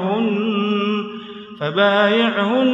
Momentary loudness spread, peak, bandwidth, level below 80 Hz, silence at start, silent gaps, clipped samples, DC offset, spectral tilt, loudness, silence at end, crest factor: 14 LU; -4 dBFS; 7.4 kHz; -70 dBFS; 0 s; none; under 0.1%; under 0.1%; -7 dB/octave; -18 LUFS; 0 s; 14 dB